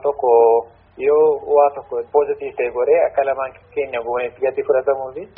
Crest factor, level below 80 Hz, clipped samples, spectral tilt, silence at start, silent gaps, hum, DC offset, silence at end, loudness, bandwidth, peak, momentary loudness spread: 14 dB; -56 dBFS; under 0.1%; -4 dB/octave; 0.05 s; none; none; under 0.1%; 0.1 s; -18 LUFS; 3.6 kHz; -2 dBFS; 10 LU